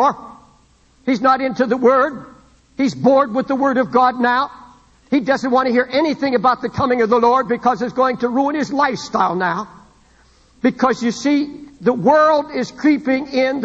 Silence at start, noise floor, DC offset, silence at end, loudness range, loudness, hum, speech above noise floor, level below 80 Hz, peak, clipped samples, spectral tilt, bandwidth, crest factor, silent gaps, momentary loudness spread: 0 s; -53 dBFS; under 0.1%; 0 s; 3 LU; -17 LUFS; none; 37 dB; -54 dBFS; -2 dBFS; under 0.1%; -5.5 dB/octave; 8 kHz; 16 dB; none; 7 LU